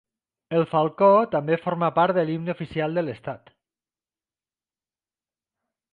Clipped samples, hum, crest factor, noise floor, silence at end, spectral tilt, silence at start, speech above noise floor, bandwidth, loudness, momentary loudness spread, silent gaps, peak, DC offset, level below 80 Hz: under 0.1%; none; 20 dB; under -90 dBFS; 2.55 s; -9.5 dB/octave; 0.5 s; over 68 dB; 4.8 kHz; -23 LUFS; 13 LU; none; -6 dBFS; under 0.1%; -64 dBFS